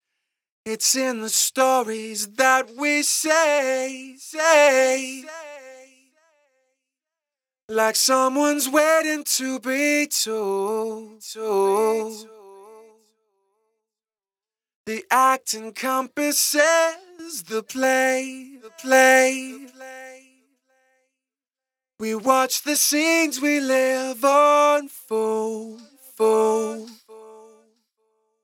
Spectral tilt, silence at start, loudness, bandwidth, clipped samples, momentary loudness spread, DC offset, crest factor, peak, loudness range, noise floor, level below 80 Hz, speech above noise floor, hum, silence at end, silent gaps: -1 dB/octave; 0.65 s; -20 LUFS; 18.5 kHz; under 0.1%; 19 LU; under 0.1%; 20 dB; -2 dBFS; 8 LU; under -90 dBFS; -80 dBFS; over 69 dB; none; 1.05 s; 7.63-7.68 s, 14.75-14.85 s